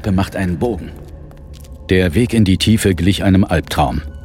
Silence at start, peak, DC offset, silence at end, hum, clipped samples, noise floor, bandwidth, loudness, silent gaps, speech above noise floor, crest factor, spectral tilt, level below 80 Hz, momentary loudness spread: 0 s; -2 dBFS; under 0.1%; 0 s; none; under 0.1%; -34 dBFS; 16.5 kHz; -15 LUFS; none; 20 dB; 14 dB; -6 dB/octave; -30 dBFS; 20 LU